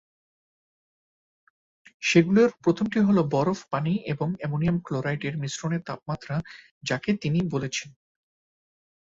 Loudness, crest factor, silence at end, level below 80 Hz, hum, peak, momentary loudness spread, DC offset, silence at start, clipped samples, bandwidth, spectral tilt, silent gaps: -26 LUFS; 22 dB; 1.2 s; -60 dBFS; none; -6 dBFS; 12 LU; under 0.1%; 2 s; under 0.1%; 7.8 kHz; -6 dB/octave; 6.71-6.81 s